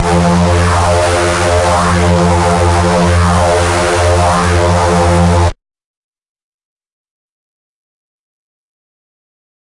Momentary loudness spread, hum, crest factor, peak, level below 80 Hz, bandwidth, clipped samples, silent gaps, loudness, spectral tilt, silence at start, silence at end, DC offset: 1 LU; none; 12 dB; 0 dBFS; -28 dBFS; 11.5 kHz; under 0.1%; none; -10 LUFS; -5.5 dB/octave; 0 s; 4.1 s; under 0.1%